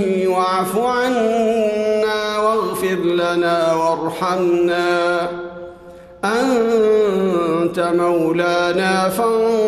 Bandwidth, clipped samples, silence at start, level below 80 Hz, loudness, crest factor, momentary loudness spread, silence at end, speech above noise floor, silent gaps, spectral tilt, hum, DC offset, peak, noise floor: 13 kHz; under 0.1%; 0 s; -54 dBFS; -17 LUFS; 12 dB; 4 LU; 0 s; 23 dB; none; -5 dB/octave; none; under 0.1%; -6 dBFS; -39 dBFS